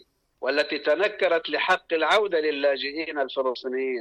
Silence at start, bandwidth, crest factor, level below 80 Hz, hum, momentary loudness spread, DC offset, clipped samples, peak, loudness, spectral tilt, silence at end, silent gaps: 0.4 s; 11 kHz; 14 dB; -68 dBFS; none; 7 LU; under 0.1%; under 0.1%; -12 dBFS; -24 LUFS; -3 dB/octave; 0 s; none